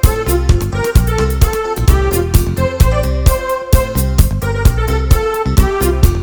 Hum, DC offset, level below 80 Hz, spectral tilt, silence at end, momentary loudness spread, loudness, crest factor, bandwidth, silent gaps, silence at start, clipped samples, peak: none; under 0.1%; -14 dBFS; -6 dB/octave; 0 s; 2 LU; -14 LUFS; 12 dB; over 20 kHz; none; 0 s; 0.7%; 0 dBFS